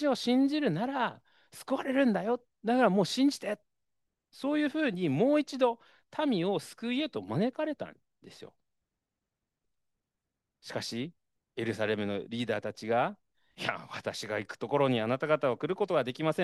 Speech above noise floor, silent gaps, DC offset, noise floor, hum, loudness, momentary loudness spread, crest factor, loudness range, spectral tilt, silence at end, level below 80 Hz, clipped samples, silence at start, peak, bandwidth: 57 dB; none; under 0.1%; -87 dBFS; none; -31 LUFS; 11 LU; 20 dB; 11 LU; -5.5 dB/octave; 0 s; -78 dBFS; under 0.1%; 0 s; -10 dBFS; 12.5 kHz